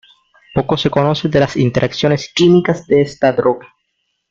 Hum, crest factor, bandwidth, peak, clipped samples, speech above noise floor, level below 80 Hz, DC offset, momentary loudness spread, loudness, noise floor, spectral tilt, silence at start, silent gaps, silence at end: none; 14 dB; 7.6 kHz; 0 dBFS; under 0.1%; 55 dB; -46 dBFS; under 0.1%; 7 LU; -15 LUFS; -69 dBFS; -6.5 dB/octave; 0.55 s; none; 0.65 s